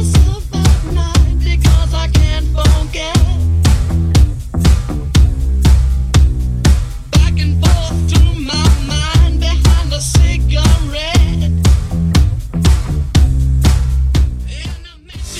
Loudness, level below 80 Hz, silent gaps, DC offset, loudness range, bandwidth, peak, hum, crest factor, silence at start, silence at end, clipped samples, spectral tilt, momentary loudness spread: -13 LUFS; -14 dBFS; none; under 0.1%; 1 LU; 14 kHz; 0 dBFS; none; 12 dB; 0 s; 0 s; under 0.1%; -5.5 dB/octave; 4 LU